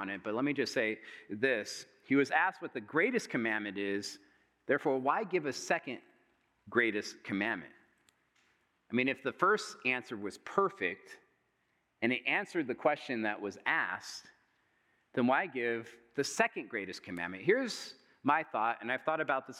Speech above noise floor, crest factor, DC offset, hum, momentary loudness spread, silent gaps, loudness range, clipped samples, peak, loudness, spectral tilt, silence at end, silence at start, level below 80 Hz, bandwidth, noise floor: 44 dB; 22 dB; under 0.1%; none; 12 LU; none; 3 LU; under 0.1%; -12 dBFS; -34 LUFS; -4 dB/octave; 0 s; 0 s; -86 dBFS; 14.5 kHz; -78 dBFS